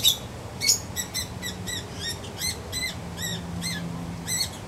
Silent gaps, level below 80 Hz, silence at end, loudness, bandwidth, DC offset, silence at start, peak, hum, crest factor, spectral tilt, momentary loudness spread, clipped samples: none; -46 dBFS; 0 s; -28 LUFS; 16 kHz; under 0.1%; 0 s; -6 dBFS; none; 24 dB; -2 dB/octave; 10 LU; under 0.1%